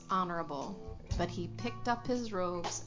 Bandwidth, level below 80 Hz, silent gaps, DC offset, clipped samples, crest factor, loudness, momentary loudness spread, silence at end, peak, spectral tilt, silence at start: 7.6 kHz; -48 dBFS; none; under 0.1%; under 0.1%; 20 dB; -37 LUFS; 8 LU; 0 s; -16 dBFS; -5 dB/octave; 0 s